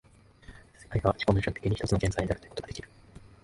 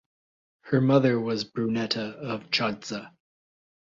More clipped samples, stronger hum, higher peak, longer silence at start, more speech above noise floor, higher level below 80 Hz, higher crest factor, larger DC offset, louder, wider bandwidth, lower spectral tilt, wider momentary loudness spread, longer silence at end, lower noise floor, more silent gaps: neither; neither; about the same, -8 dBFS vs -8 dBFS; second, 0.5 s vs 0.65 s; second, 24 dB vs over 64 dB; first, -44 dBFS vs -68 dBFS; about the same, 24 dB vs 20 dB; neither; second, -30 LUFS vs -26 LUFS; first, 11.5 kHz vs 7.6 kHz; about the same, -6.5 dB/octave vs -6 dB/octave; about the same, 15 LU vs 13 LU; second, 0.15 s vs 0.9 s; second, -53 dBFS vs under -90 dBFS; neither